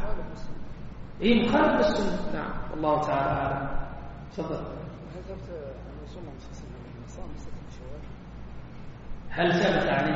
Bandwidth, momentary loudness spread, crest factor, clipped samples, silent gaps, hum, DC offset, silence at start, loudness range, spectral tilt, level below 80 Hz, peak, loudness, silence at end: 7.6 kHz; 21 LU; 20 dB; under 0.1%; none; none; under 0.1%; 0 s; 16 LU; -4.5 dB/octave; -40 dBFS; -8 dBFS; -27 LUFS; 0 s